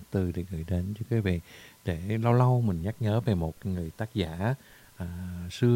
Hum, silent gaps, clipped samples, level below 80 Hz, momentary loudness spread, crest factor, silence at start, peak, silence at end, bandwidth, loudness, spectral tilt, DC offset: none; none; under 0.1%; -48 dBFS; 14 LU; 18 dB; 0 s; -10 dBFS; 0 s; 16 kHz; -30 LUFS; -8 dB/octave; under 0.1%